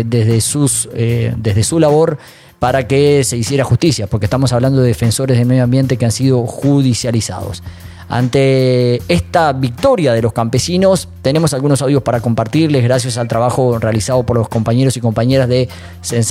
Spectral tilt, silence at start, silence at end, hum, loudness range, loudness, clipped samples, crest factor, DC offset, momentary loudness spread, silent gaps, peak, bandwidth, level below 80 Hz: -6 dB/octave; 0 s; 0 s; none; 1 LU; -13 LUFS; under 0.1%; 12 dB; under 0.1%; 5 LU; none; 0 dBFS; 15 kHz; -40 dBFS